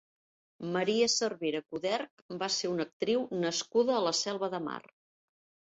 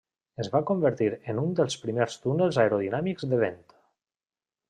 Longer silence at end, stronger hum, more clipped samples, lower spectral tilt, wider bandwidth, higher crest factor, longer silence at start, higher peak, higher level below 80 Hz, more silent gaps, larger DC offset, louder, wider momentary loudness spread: second, 0.85 s vs 1.15 s; neither; neither; second, -3 dB/octave vs -6.5 dB/octave; second, 8.2 kHz vs 11 kHz; about the same, 18 dB vs 18 dB; first, 0.6 s vs 0.4 s; second, -16 dBFS vs -8 dBFS; second, -76 dBFS vs -68 dBFS; first, 2.11-2.29 s, 2.93-3.00 s vs none; neither; second, -31 LUFS vs -27 LUFS; first, 10 LU vs 6 LU